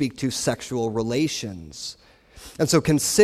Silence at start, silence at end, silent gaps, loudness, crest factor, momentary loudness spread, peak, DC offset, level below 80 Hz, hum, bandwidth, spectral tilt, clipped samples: 0 s; 0 s; none; -24 LUFS; 20 dB; 15 LU; -4 dBFS; under 0.1%; -50 dBFS; none; 15.5 kHz; -4.5 dB/octave; under 0.1%